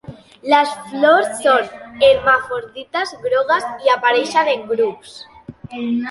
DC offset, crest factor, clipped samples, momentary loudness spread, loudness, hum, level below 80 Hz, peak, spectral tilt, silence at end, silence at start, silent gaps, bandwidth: under 0.1%; 16 dB; under 0.1%; 15 LU; -17 LUFS; none; -54 dBFS; 0 dBFS; -3.5 dB/octave; 0 s; 0.1 s; none; 11.5 kHz